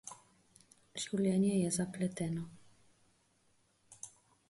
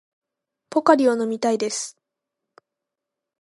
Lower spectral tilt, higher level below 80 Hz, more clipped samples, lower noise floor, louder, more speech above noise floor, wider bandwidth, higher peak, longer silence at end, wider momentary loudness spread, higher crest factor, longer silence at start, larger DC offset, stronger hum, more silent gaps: first, -5.5 dB/octave vs -3.5 dB/octave; about the same, -72 dBFS vs -76 dBFS; neither; second, -73 dBFS vs -85 dBFS; second, -35 LUFS vs -21 LUFS; second, 39 dB vs 65 dB; about the same, 11.5 kHz vs 11.5 kHz; second, -22 dBFS vs -2 dBFS; second, 0.4 s vs 1.5 s; first, 20 LU vs 11 LU; second, 16 dB vs 22 dB; second, 0.05 s vs 0.7 s; neither; neither; neither